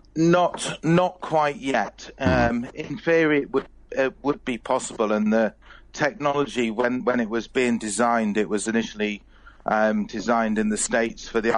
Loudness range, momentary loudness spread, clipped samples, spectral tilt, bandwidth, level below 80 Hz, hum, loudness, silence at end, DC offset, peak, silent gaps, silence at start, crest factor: 2 LU; 8 LU; under 0.1%; -5 dB/octave; 10.5 kHz; -48 dBFS; none; -23 LUFS; 0 s; under 0.1%; -8 dBFS; none; 0.15 s; 16 dB